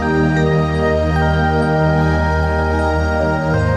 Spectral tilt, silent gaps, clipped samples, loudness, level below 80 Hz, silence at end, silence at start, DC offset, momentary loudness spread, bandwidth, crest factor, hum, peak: -7.5 dB/octave; none; under 0.1%; -16 LUFS; -24 dBFS; 0 s; 0 s; under 0.1%; 2 LU; 10 kHz; 12 dB; none; -4 dBFS